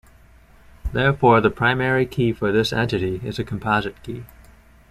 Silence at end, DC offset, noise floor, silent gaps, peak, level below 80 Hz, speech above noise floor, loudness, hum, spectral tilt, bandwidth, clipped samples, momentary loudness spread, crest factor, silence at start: 0.65 s; under 0.1%; -50 dBFS; none; -2 dBFS; -40 dBFS; 30 dB; -20 LUFS; none; -6.5 dB/octave; 14.5 kHz; under 0.1%; 17 LU; 20 dB; 0.85 s